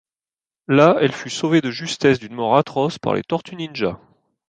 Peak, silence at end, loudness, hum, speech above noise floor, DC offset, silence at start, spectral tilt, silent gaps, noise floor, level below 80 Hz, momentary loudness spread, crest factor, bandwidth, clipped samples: -2 dBFS; 0.55 s; -19 LUFS; none; over 71 dB; under 0.1%; 0.7 s; -5.5 dB/octave; none; under -90 dBFS; -58 dBFS; 11 LU; 18 dB; 9.6 kHz; under 0.1%